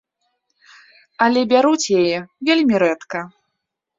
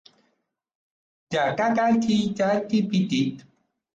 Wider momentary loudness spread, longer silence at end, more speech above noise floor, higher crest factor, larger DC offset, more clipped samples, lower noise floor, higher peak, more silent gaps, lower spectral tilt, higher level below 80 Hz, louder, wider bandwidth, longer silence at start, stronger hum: first, 13 LU vs 5 LU; first, 0.7 s vs 0.55 s; first, 61 dB vs 52 dB; about the same, 18 dB vs 14 dB; neither; neither; first, -78 dBFS vs -74 dBFS; first, -2 dBFS vs -12 dBFS; neither; second, -4 dB/octave vs -6 dB/octave; about the same, -62 dBFS vs -64 dBFS; first, -17 LUFS vs -23 LUFS; about the same, 7.8 kHz vs 8 kHz; about the same, 1.2 s vs 1.3 s; neither